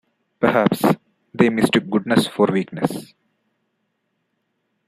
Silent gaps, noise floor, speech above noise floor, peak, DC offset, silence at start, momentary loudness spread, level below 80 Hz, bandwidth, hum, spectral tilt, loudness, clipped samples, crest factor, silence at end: none; -72 dBFS; 54 dB; -2 dBFS; under 0.1%; 0.4 s; 8 LU; -60 dBFS; 15.5 kHz; none; -6 dB/octave; -19 LUFS; under 0.1%; 20 dB; 1.85 s